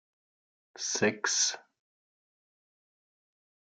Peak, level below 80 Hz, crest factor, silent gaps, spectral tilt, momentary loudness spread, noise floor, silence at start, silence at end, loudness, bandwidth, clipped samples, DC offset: -12 dBFS; -86 dBFS; 24 dB; none; -1 dB/octave; 10 LU; under -90 dBFS; 0.75 s; 2 s; -29 LUFS; 11 kHz; under 0.1%; under 0.1%